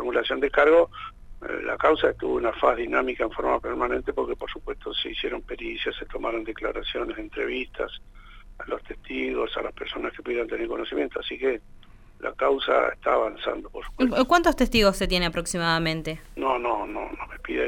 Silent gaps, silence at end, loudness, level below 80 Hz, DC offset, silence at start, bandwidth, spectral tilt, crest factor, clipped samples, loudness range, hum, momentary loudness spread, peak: none; 0 s; -26 LUFS; -42 dBFS; under 0.1%; 0 s; 16 kHz; -4.5 dB/octave; 20 dB; under 0.1%; 8 LU; none; 14 LU; -6 dBFS